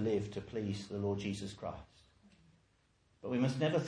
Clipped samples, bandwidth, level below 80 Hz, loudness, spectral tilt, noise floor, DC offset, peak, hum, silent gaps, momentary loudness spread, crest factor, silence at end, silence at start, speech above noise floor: under 0.1%; 10.5 kHz; -66 dBFS; -38 LUFS; -6.5 dB/octave; -73 dBFS; under 0.1%; -20 dBFS; none; none; 12 LU; 18 dB; 0 s; 0 s; 36 dB